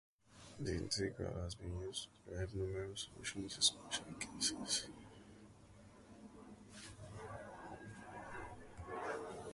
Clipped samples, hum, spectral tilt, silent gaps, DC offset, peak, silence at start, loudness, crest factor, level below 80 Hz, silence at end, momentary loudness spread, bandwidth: under 0.1%; none; -3 dB/octave; none; under 0.1%; -20 dBFS; 0.25 s; -43 LUFS; 26 dB; -60 dBFS; 0 s; 22 LU; 11.5 kHz